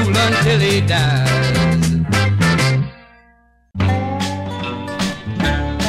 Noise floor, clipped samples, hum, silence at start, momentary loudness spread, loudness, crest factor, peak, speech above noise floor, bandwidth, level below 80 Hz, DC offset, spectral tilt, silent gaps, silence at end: -53 dBFS; under 0.1%; 60 Hz at -45 dBFS; 0 s; 10 LU; -17 LUFS; 14 dB; -4 dBFS; 39 dB; 15.5 kHz; -34 dBFS; under 0.1%; -5.5 dB/octave; none; 0 s